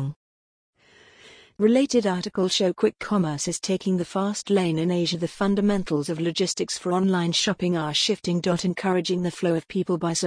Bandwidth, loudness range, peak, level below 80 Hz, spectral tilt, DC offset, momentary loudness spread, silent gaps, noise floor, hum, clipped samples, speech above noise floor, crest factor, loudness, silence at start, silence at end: 10.5 kHz; 1 LU; -8 dBFS; -56 dBFS; -5 dB/octave; under 0.1%; 5 LU; 0.16-0.73 s; -54 dBFS; none; under 0.1%; 31 dB; 16 dB; -24 LUFS; 0 s; 0 s